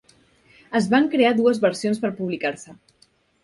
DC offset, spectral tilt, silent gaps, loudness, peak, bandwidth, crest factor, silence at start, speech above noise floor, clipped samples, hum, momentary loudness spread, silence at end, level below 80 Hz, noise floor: under 0.1%; -5.5 dB/octave; none; -21 LUFS; -4 dBFS; 11.5 kHz; 18 dB; 0.7 s; 36 dB; under 0.1%; none; 9 LU; 0.7 s; -66 dBFS; -57 dBFS